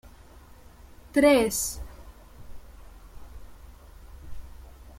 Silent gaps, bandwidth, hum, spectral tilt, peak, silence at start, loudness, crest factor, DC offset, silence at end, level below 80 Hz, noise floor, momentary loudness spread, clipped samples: none; 16.5 kHz; none; -3.5 dB/octave; -8 dBFS; 0.35 s; -23 LUFS; 22 dB; under 0.1%; 0 s; -46 dBFS; -50 dBFS; 29 LU; under 0.1%